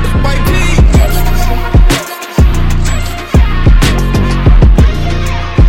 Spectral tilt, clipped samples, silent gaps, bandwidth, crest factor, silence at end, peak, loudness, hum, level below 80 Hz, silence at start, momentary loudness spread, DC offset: -6 dB/octave; under 0.1%; none; 16.5 kHz; 8 dB; 0 s; 0 dBFS; -11 LUFS; none; -10 dBFS; 0 s; 7 LU; 2%